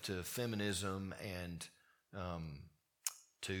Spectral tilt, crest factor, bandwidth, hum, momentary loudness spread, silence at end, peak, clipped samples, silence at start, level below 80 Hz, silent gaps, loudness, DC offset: -4 dB/octave; 26 dB; 19 kHz; none; 14 LU; 0 s; -18 dBFS; under 0.1%; 0 s; -66 dBFS; none; -44 LUFS; under 0.1%